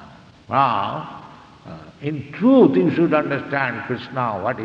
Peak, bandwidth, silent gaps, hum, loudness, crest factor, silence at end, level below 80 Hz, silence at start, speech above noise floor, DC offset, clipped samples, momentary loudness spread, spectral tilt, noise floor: -2 dBFS; 6.2 kHz; none; none; -19 LUFS; 18 dB; 0 s; -60 dBFS; 0 s; 25 dB; under 0.1%; under 0.1%; 23 LU; -8.5 dB/octave; -44 dBFS